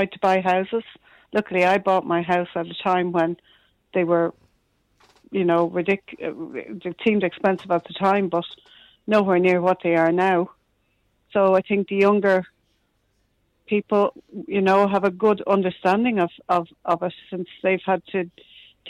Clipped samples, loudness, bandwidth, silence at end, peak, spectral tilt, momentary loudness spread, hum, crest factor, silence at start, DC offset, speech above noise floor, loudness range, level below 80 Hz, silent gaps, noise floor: under 0.1%; -22 LUFS; 10.5 kHz; 0 s; -8 dBFS; -7.5 dB/octave; 12 LU; none; 14 dB; 0 s; under 0.1%; 47 dB; 4 LU; -64 dBFS; none; -68 dBFS